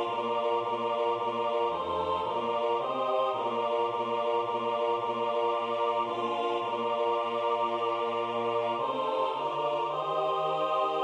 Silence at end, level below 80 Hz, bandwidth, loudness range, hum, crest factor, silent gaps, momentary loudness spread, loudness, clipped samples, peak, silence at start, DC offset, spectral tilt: 0 s; -72 dBFS; 9.4 kHz; 0 LU; none; 12 dB; none; 2 LU; -30 LUFS; under 0.1%; -18 dBFS; 0 s; under 0.1%; -5.5 dB/octave